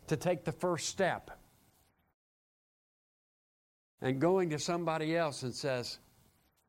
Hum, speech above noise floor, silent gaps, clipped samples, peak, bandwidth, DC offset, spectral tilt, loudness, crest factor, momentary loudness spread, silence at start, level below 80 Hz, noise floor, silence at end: none; 37 dB; 2.14-3.98 s; under 0.1%; -18 dBFS; 16 kHz; under 0.1%; -5 dB/octave; -34 LUFS; 18 dB; 10 LU; 0.05 s; -68 dBFS; -71 dBFS; 0.7 s